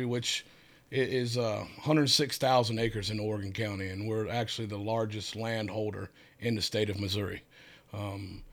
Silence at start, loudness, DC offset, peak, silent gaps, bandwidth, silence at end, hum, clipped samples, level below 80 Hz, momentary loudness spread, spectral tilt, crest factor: 0 s; -31 LUFS; under 0.1%; -12 dBFS; none; 19.5 kHz; 0 s; none; under 0.1%; -60 dBFS; 12 LU; -4.5 dB/octave; 20 dB